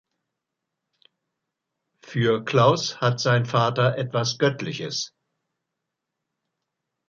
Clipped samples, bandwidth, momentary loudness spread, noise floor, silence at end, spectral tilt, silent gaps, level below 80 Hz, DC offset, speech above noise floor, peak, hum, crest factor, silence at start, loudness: under 0.1%; 7.6 kHz; 11 LU; -83 dBFS; 2 s; -5 dB/octave; none; -66 dBFS; under 0.1%; 61 dB; -4 dBFS; none; 22 dB; 2.05 s; -23 LUFS